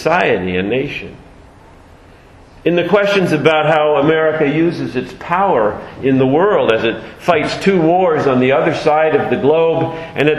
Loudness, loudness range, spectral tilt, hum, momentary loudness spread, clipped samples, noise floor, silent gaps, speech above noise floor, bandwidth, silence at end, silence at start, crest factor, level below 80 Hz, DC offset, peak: -14 LUFS; 3 LU; -6.5 dB/octave; none; 8 LU; under 0.1%; -41 dBFS; none; 28 dB; 12.5 kHz; 0 s; 0 s; 14 dB; -46 dBFS; under 0.1%; 0 dBFS